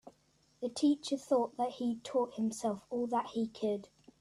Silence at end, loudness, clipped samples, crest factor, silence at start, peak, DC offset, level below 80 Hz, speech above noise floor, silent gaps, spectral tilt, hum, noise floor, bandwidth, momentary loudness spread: 0.35 s; -35 LUFS; under 0.1%; 18 dB; 0.05 s; -18 dBFS; under 0.1%; -76 dBFS; 37 dB; none; -5 dB/octave; none; -71 dBFS; 13 kHz; 6 LU